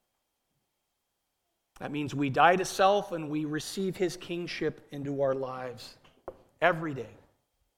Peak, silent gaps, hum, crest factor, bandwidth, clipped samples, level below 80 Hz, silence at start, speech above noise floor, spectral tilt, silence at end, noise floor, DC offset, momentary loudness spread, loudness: -8 dBFS; none; none; 24 dB; 16.5 kHz; under 0.1%; -64 dBFS; 1.8 s; 52 dB; -5 dB/octave; 0.65 s; -81 dBFS; under 0.1%; 23 LU; -29 LUFS